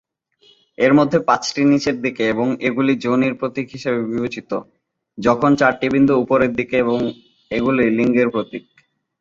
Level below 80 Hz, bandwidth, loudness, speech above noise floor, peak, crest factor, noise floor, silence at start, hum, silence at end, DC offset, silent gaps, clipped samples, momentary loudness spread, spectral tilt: -54 dBFS; 7.6 kHz; -18 LUFS; 39 dB; -2 dBFS; 18 dB; -56 dBFS; 0.8 s; none; 0.6 s; under 0.1%; none; under 0.1%; 10 LU; -6 dB/octave